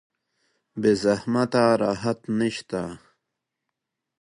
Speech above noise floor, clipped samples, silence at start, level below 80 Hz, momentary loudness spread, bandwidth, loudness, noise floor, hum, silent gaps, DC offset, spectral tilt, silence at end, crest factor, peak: 60 dB; under 0.1%; 0.75 s; -60 dBFS; 11 LU; 11 kHz; -23 LUFS; -83 dBFS; none; none; under 0.1%; -6 dB/octave; 1.25 s; 18 dB; -6 dBFS